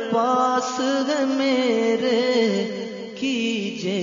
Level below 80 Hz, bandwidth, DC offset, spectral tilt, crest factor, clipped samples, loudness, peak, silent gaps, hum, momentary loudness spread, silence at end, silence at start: -70 dBFS; 7.6 kHz; under 0.1%; -4.5 dB/octave; 14 dB; under 0.1%; -22 LUFS; -8 dBFS; none; none; 7 LU; 0 s; 0 s